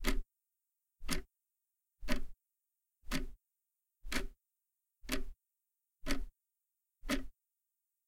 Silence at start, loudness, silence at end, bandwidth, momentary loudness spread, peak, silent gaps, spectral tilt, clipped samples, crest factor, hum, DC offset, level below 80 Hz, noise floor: 0 s; -43 LUFS; 0.75 s; 16.5 kHz; 16 LU; -18 dBFS; none; -3.5 dB/octave; under 0.1%; 22 dB; none; under 0.1%; -44 dBFS; -88 dBFS